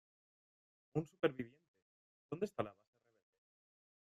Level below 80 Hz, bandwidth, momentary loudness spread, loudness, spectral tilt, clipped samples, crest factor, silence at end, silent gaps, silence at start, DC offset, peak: -80 dBFS; 13 kHz; 12 LU; -43 LUFS; -7 dB/octave; under 0.1%; 26 dB; 1.35 s; 1.68-1.74 s, 1.82-2.29 s; 0.95 s; under 0.1%; -20 dBFS